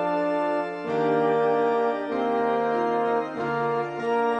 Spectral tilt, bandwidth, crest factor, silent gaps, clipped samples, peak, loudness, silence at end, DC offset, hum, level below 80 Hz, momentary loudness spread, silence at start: -7 dB/octave; 8.4 kHz; 14 dB; none; under 0.1%; -10 dBFS; -25 LUFS; 0 s; under 0.1%; none; -68 dBFS; 5 LU; 0 s